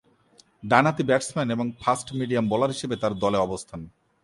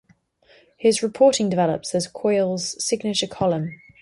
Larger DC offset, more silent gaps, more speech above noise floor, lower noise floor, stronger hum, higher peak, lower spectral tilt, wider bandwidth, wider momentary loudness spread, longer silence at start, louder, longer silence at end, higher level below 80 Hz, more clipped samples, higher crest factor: neither; neither; about the same, 35 dB vs 37 dB; about the same, -59 dBFS vs -58 dBFS; neither; first, -2 dBFS vs -6 dBFS; about the same, -5.5 dB/octave vs -4.5 dB/octave; about the same, 11.5 kHz vs 11.5 kHz; first, 12 LU vs 7 LU; second, 0.65 s vs 0.8 s; second, -24 LUFS vs -21 LUFS; about the same, 0.35 s vs 0.25 s; about the same, -56 dBFS vs -60 dBFS; neither; about the same, 22 dB vs 18 dB